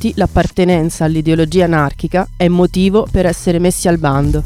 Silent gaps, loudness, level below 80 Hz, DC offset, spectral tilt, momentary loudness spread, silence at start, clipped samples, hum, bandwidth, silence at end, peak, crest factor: none; -13 LUFS; -26 dBFS; under 0.1%; -6.5 dB/octave; 3 LU; 0 s; under 0.1%; none; 15.5 kHz; 0 s; 0 dBFS; 12 dB